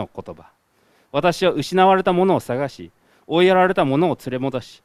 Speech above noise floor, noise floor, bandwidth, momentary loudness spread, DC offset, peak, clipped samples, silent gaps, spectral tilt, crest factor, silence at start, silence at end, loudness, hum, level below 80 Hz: 41 dB; -60 dBFS; 14 kHz; 12 LU; under 0.1%; 0 dBFS; under 0.1%; none; -6 dB/octave; 18 dB; 0 s; 0.15 s; -18 LUFS; none; -54 dBFS